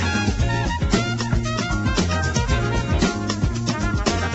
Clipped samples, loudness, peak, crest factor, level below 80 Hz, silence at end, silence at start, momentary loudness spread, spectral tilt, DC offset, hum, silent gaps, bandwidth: under 0.1%; -22 LUFS; -4 dBFS; 16 dB; -28 dBFS; 0 s; 0 s; 2 LU; -5 dB/octave; under 0.1%; none; none; 8.2 kHz